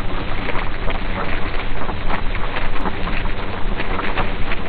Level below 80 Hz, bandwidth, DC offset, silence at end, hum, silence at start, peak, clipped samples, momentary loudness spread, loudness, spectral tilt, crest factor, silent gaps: -22 dBFS; 4.7 kHz; 4%; 0 s; none; 0 s; -4 dBFS; under 0.1%; 3 LU; -25 LUFS; -8.5 dB/octave; 12 dB; none